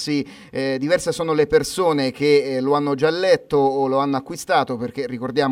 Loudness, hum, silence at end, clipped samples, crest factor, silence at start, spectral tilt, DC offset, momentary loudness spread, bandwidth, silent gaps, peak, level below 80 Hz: -20 LUFS; none; 0 s; under 0.1%; 16 dB; 0 s; -5 dB/octave; under 0.1%; 8 LU; 15.5 kHz; none; -4 dBFS; -52 dBFS